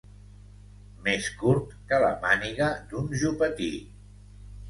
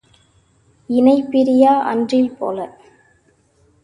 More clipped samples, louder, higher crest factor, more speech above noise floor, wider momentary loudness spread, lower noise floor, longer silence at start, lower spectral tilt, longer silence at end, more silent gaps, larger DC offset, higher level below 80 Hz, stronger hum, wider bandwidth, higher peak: neither; second, -27 LUFS vs -16 LUFS; about the same, 20 dB vs 16 dB; second, 22 dB vs 43 dB; second, 9 LU vs 12 LU; second, -48 dBFS vs -57 dBFS; about the same, 1 s vs 0.9 s; second, -5 dB/octave vs -6.5 dB/octave; second, 0 s vs 1.15 s; neither; neither; first, -48 dBFS vs -60 dBFS; first, 50 Hz at -45 dBFS vs none; first, 11.5 kHz vs 10 kHz; second, -8 dBFS vs 0 dBFS